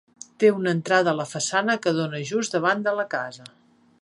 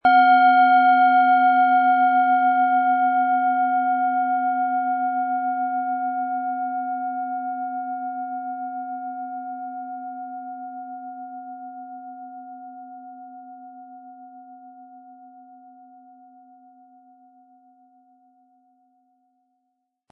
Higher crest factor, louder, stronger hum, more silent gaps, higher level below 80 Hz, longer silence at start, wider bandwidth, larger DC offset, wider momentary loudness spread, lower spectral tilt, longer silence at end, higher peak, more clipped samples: about the same, 18 dB vs 16 dB; second, -23 LUFS vs -20 LUFS; neither; neither; about the same, -74 dBFS vs -78 dBFS; first, 0.4 s vs 0.05 s; first, 11.5 kHz vs 4.5 kHz; neither; second, 8 LU vs 25 LU; second, -4.5 dB/octave vs -6.5 dB/octave; second, 0.55 s vs 4.85 s; about the same, -6 dBFS vs -6 dBFS; neither